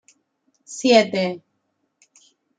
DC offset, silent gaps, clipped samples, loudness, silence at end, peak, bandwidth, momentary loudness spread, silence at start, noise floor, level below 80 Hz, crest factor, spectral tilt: under 0.1%; none; under 0.1%; -19 LUFS; 1.2 s; 0 dBFS; 9.4 kHz; 21 LU; 0.7 s; -72 dBFS; -72 dBFS; 24 dB; -4 dB/octave